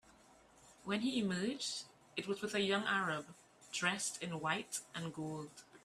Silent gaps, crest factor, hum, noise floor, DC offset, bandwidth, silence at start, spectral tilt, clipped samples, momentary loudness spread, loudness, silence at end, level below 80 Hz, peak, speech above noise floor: none; 22 dB; none; -65 dBFS; under 0.1%; 14.5 kHz; 0.6 s; -3.5 dB/octave; under 0.1%; 11 LU; -39 LUFS; 0.05 s; -78 dBFS; -18 dBFS; 26 dB